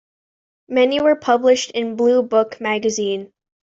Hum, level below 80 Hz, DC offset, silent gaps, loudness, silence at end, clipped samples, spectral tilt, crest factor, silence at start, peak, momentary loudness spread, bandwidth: none; -64 dBFS; under 0.1%; none; -18 LUFS; 0.45 s; under 0.1%; -3.5 dB/octave; 16 dB; 0.7 s; -4 dBFS; 8 LU; 7.8 kHz